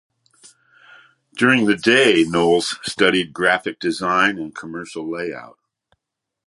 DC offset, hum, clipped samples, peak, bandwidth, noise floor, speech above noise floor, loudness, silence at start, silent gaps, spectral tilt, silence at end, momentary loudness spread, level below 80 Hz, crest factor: under 0.1%; none; under 0.1%; 0 dBFS; 11.5 kHz; -82 dBFS; 64 dB; -18 LUFS; 1.35 s; none; -4 dB/octave; 0.95 s; 16 LU; -58 dBFS; 20 dB